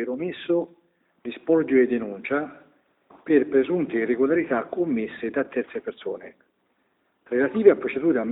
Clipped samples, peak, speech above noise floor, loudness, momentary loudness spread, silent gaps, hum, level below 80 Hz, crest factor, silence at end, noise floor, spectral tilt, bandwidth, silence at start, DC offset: under 0.1%; -2 dBFS; 47 dB; -24 LUFS; 15 LU; none; none; -66 dBFS; 22 dB; 0 s; -70 dBFS; -11 dB/octave; 4 kHz; 0 s; under 0.1%